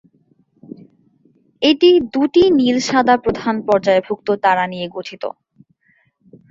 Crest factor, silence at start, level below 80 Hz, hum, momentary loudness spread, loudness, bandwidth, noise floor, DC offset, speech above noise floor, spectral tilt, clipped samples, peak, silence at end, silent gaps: 16 dB; 1.6 s; -52 dBFS; none; 14 LU; -15 LUFS; 7.6 kHz; -60 dBFS; under 0.1%; 45 dB; -4.5 dB/octave; under 0.1%; -2 dBFS; 1.2 s; none